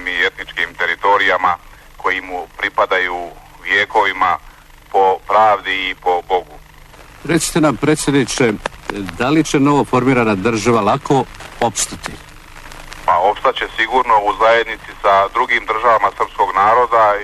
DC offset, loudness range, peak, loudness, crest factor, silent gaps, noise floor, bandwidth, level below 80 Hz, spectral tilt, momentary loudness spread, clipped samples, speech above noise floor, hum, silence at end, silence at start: under 0.1%; 3 LU; -2 dBFS; -15 LUFS; 14 dB; none; -40 dBFS; 13.5 kHz; -40 dBFS; -4 dB/octave; 11 LU; under 0.1%; 26 dB; none; 0 s; 0 s